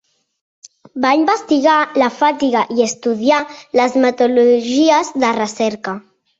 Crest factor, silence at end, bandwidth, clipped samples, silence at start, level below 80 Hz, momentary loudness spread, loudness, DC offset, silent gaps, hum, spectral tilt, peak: 14 dB; 0.4 s; 8 kHz; under 0.1%; 0.95 s; -62 dBFS; 7 LU; -15 LUFS; under 0.1%; none; none; -3.5 dB/octave; -2 dBFS